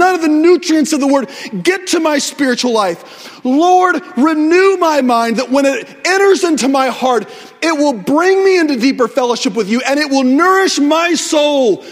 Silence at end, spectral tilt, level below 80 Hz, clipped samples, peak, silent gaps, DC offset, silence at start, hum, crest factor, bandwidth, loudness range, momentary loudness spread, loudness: 0 s; -3 dB/octave; -62 dBFS; under 0.1%; 0 dBFS; none; under 0.1%; 0 s; none; 12 dB; 16 kHz; 2 LU; 6 LU; -12 LUFS